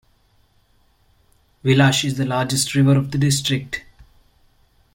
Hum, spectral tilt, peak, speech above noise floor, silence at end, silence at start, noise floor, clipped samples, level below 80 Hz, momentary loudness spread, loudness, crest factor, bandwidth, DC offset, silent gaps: none; -4.5 dB/octave; -4 dBFS; 41 dB; 1.15 s; 1.65 s; -59 dBFS; under 0.1%; -50 dBFS; 10 LU; -19 LUFS; 18 dB; 16.5 kHz; under 0.1%; none